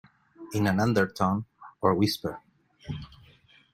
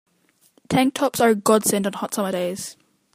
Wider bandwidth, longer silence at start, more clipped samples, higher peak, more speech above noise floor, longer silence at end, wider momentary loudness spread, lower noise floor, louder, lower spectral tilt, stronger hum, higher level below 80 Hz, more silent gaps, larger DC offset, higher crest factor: about the same, 16 kHz vs 15.5 kHz; second, 0.4 s vs 0.7 s; neither; second, -8 dBFS vs -2 dBFS; second, 32 dB vs 41 dB; first, 0.65 s vs 0.45 s; first, 21 LU vs 10 LU; second, -58 dBFS vs -62 dBFS; second, -27 LUFS vs -21 LUFS; first, -6 dB/octave vs -4 dB/octave; neither; about the same, -58 dBFS vs -60 dBFS; neither; neither; about the same, 22 dB vs 20 dB